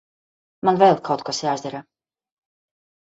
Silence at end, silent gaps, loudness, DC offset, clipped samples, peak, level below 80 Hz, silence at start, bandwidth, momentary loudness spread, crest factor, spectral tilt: 1.3 s; none; -20 LUFS; under 0.1%; under 0.1%; -2 dBFS; -68 dBFS; 0.65 s; 8 kHz; 15 LU; 20 dB; -5 dB/octave